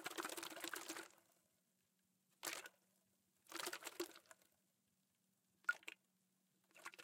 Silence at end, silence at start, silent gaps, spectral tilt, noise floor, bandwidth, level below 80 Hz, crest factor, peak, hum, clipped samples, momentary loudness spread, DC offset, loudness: 0 s; 0 s; none; -0.5 dB/octave; -85 dBFS; 16.5 kHz; under -90 dBFS; 28 dB; -26 dBFS; none; under 0.1%; 17 LU; under 0.1%; -50 LUFS